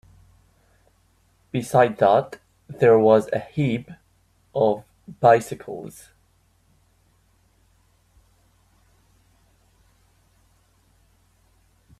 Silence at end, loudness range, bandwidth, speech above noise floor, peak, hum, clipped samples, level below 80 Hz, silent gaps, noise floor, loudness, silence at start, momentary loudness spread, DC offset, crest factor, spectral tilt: 6.1 s; 5 LU; 14 kHz; 43 dB; -2 dBFS; none; under 0.1%; -60 dBFS; none; -62 dBFS; -20 LUFS; 1.55 s; 20 LU; under 0.1%; 22 dB; -7 dB/octave